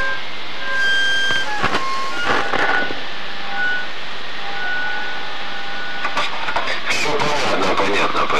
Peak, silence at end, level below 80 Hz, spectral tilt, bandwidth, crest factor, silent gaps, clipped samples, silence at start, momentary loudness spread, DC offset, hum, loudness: -2 dBFS; 0 s; -50 dBFS; -2.5 dB/octave; 15 kHz; 18 dB; none; under 0.1%; 0 s; 10 LU; 10%; none; -20 LUFS